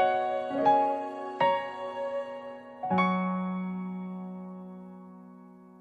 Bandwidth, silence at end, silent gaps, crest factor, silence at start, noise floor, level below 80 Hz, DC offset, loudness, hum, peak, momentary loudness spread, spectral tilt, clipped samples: 7.4 kHz; 0 s; none; 18 dB; 0 s; -51 dBFS; -76 dBFS; under 0.1%; -30 LUFS; none; -12 dBFS; 20 LU; -8 dB/octave; under 0.1%